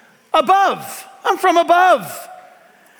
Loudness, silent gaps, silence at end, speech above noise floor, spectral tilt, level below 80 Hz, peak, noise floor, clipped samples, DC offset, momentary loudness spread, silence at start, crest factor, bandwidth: -15 LUFS; none; 0.65 s; 33 dB; -3 dB/octave; -66 dBFS; -4 dBFS; -48 dBFS; under 0.1%; under 0.1%; 18 LU; 0.35 s; 14 dB; over 20 kHz